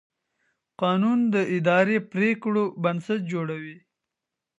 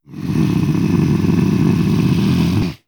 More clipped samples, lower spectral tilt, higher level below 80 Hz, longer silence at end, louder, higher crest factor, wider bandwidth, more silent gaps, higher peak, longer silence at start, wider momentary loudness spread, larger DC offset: neither; about the same, -7.5 dB/octave vs -7.5 dB/octave; second, -76 dBFS vs -36 dBFS; first, 0.8 s vs 0.1 s; second, -24 LUFS vs -16 LUFS; first, 20 dB vs 12 dB; second, 8 kHz vs 20 kHz; neither; about the same, -6 dBFS vs -4 dBFS; first, 0.8 s vs 0.1 s; first, 9 LU vs 2 LU; neither